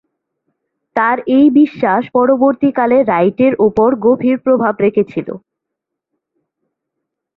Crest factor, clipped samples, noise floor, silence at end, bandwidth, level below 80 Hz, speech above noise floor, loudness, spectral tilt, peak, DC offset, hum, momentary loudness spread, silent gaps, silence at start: 14 dB; under 0.1%; -79 dBFS; 2 s; 4.7 kHz; -54 dBFS; 67 dB; -13 LUFS; -9.5 dB/octave; 0 dBFS; under 0.1%; none; 8 LU; none; 0.95 s